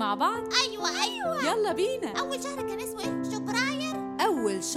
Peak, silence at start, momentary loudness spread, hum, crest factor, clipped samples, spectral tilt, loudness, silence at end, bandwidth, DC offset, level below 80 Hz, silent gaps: -8 dBFS; 0 s; 7 LU; none; 20 dB; under 0.1%; -2.5 dB/octave; -28 LUFS; 0 s; 16.5 kHz; under 0.1%; -64 dBFS; none